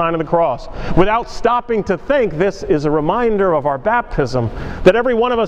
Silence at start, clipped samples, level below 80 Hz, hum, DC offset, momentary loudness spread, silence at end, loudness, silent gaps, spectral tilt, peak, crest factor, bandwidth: 0 s; under 0.1%; -32 dBFS; none; under 0.1%; 5 LU; 0 s; -16 LUFS; none; -7 dB/octave; 0 dBFS; 16 dB; 9 kHz